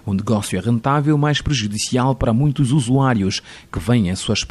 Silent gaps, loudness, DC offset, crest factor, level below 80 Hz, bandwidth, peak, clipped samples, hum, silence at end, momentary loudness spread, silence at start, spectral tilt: none; -18 LUFS; under 0.1%; 12 dB; -38 dBFS; 12.5 kHz; -6 dBFS; under 0.1%; none; 0.05 s; 4 LU; 0.05 s; -5.5 dB/octave